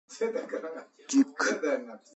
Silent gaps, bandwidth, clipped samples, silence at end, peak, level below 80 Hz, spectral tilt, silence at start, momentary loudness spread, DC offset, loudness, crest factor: none; 8.2 kHz; under 0.1%; 0.2 s; -12 dBFS; -86 dBFS; -2.5 dB/octave; 0.1 s; 12 LU; under 0.1%; -30 LUFS; 18 dB